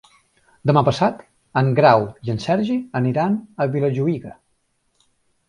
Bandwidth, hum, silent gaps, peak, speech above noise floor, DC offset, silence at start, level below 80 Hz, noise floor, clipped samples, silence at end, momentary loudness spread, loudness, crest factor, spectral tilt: 10.5 kHz; none; none; 0 dBFS; 49 dB; under 0.1%; 0.65 s; -56 dBFS; -67 dBFS; under 0.1%; 1.15 s; 11 LU; -20 LUFS; 20 dB; -7.5 dB/octave